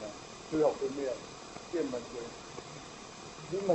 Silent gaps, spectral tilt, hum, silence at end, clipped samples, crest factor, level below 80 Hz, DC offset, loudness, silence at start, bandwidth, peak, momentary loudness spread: none; -5 dB/octave; none; 0 s; under 0.1%; 20 dB; -64 dBFS; under 0.1%; -37 LUFS; 0 s; 10.5 kHz; -16 dBFS; 16 LU